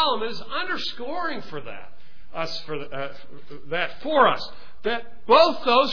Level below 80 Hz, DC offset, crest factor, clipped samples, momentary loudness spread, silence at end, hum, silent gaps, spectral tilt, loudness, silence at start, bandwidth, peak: -56 dBFS; 4%; 20 dB; under 0.1%; 19 LU; 0 s; none; none; -4.5 dB/octave; -24 LUFS; 0 s; 5.4 kHz; -4 dBFS